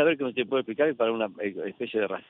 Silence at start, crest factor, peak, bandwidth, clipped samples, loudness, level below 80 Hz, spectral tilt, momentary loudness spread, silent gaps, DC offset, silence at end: 0 s; 16 dB; -12 dBFS; 4 kHz; under 0.1%; -28 LUFS; -76 dBFS; -8.5 dB/octave; 8 LU; none; under 0.1%; 0.1 s